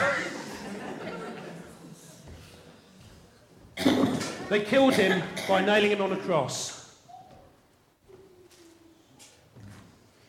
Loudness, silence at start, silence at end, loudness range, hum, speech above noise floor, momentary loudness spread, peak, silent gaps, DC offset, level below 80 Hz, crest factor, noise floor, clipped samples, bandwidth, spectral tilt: -27 LUFS; 0 s; 0.5 s; 17 LU; none; 38 dB; 26 LU; -10 dBFS; none; under 0.1%; -66 dBFS; 20 dB; -63 dBFS; under 0.1%; 16.5 kHz; -4.5 dB/octave